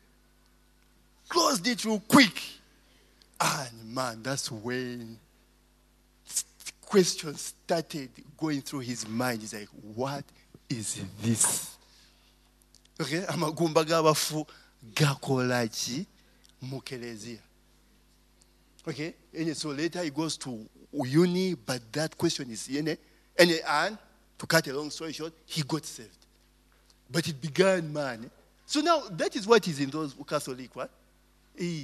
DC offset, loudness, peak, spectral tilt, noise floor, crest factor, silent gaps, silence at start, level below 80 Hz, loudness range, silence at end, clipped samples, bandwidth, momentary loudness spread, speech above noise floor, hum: under 0.1%; -29 LUFS; -2 dBFS; -4 dB/octave; -63 dBFS; 28 dB; none; 1.3 s; -66 dBFS; 8 LU; 0 s; under 0.1%; 13.5 kHz; 17 LU; 34 dB; 50 Hz at -60 dBFS